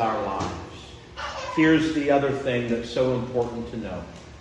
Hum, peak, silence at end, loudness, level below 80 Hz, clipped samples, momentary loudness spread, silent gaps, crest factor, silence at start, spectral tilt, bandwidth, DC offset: none; -8 dBFS; 0 s; -25 LUFS; -48 dBFS; under 0.1%; 17 LU; none; 18 dB; 0 s; -6 dB/octave; 9.4 kHz; under 0.1%